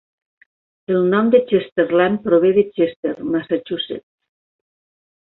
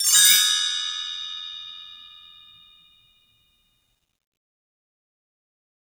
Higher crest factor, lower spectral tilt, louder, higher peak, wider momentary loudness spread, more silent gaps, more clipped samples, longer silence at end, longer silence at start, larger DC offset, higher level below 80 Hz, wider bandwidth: second, 16 dB vs 24 dB; first, -10 dB/octave vs 5 dB/octave; about the same, -18 LUFS vs -18 LUFS; about the same, -2 dBFS vs -4 dBFS; second, 11 LU vs 26 LU; first, 1.72-1.76 s, 2.96-3.03 s vs none; neither; second, 1.25 s vs 3.8 s; first, 0.9 s vs 0 s; neither; first, -60 dBFS vs -74 dBFS; second, 4.1 kHz vs over 20 kHz